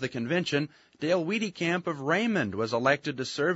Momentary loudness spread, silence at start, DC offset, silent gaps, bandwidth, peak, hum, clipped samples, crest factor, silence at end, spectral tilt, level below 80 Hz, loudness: 5 LU; 0 s; under 0.1%; none; 8 kHz; -10 dBFS; none; under 0.1%; 20 dB; 0 s; -5 dB/octave; -70 dBFS; -28 LUFS